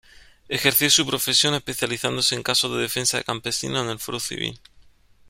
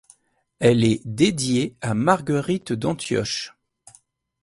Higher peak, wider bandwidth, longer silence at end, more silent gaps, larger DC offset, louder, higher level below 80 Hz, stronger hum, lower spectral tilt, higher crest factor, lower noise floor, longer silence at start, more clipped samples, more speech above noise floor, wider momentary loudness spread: about the same, -2 dBFS vs -2 dBFS; first, 16.5 kHz vs 11.5 kHz; second, 0.7 s vs 0.95 s; neither; neither; about the same, -21 LUFS vs -22 LUFS; about the same, -54 dBFS vs -54 dBFS; neither; second, -2 dB/octave vs -5.5 dB/octave; about the same, 22 dB vs 20 dB; second, -53 dBFS vs -58 dBFS; second, 0.15 s vs 0.6 s; neither; second, 30 dB vs 37 dB; first, 11 LU vs 7 LU